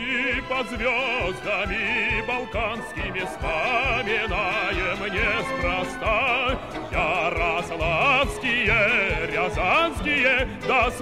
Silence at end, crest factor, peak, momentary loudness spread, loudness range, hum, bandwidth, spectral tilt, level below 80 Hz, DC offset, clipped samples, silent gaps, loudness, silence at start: 0 s; 16 dB; -8 dBFS; 8 LU; 4 LU; none; 15.5 kHz; -4.5 dB/octave; -38 dBFS; 0.3%; under 0.1%; none; -23 LUFS; 0 s